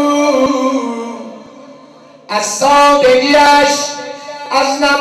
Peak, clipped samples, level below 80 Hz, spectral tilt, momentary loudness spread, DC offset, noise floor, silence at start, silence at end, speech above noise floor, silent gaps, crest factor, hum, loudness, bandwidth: -4 dBFS; under 0.1%; -46 dBFS; -2 dB/octave; 18 LU; under 0.1%; -39 dBFS; 0 s; 0 s; 29 dB; none; 10 dB; none; -11 LUFS; 14 kHz